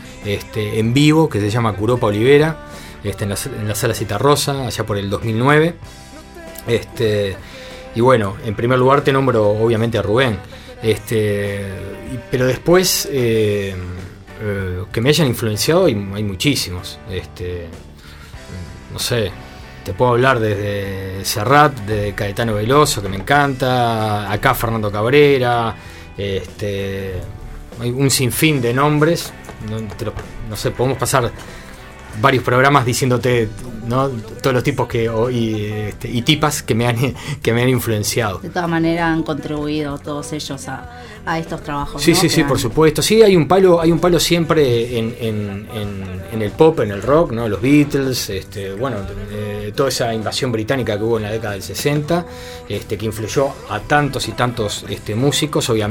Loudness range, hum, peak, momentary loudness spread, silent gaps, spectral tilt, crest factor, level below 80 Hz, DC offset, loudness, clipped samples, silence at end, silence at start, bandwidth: 5 LU; none; 0 dBFS; 16 LU; none; -5 dB/octave; 18 dB; -38 dBFS; under 0.1%; -17 LUFS; under 0.1%; 0 s; 0 s; 17 kHz